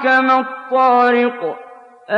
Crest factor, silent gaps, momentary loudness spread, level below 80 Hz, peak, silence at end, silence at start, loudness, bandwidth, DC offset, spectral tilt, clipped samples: 12 dB; none; 14 LU; -74 dBFS; -4 dBFS; 0 s; 0 s; -15 LUFS; 7.4 kHz; under 0.1%; -5 dB/octave; under 0.1%